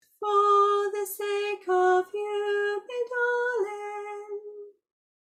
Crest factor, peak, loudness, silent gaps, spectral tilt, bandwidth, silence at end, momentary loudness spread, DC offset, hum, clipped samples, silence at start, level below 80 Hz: 14 dB; -12 dBFS; -26 LUFS; none; -1.5 dB/octave; 15 kHz; 0.55 s; 16 LU; under 0.1%; none; under 0.1%; 0.2 s; -80 dBFS